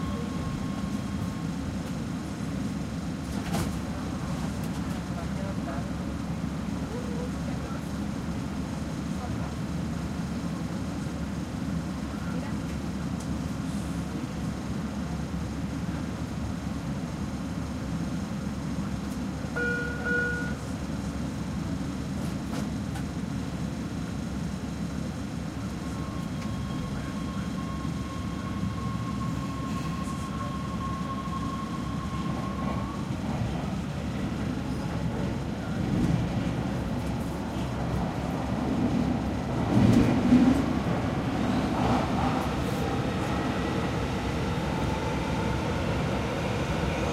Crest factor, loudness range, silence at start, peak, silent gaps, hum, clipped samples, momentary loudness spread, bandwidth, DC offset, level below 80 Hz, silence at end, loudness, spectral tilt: 22 dB; 8 LU; 0 s; -8 dBFS; none; none; under 0.1%; 6 LU; 15.5 kHz; under 0.1%; -40 dBFS; 0 s; -31 LUFS; -6.5 dB/octave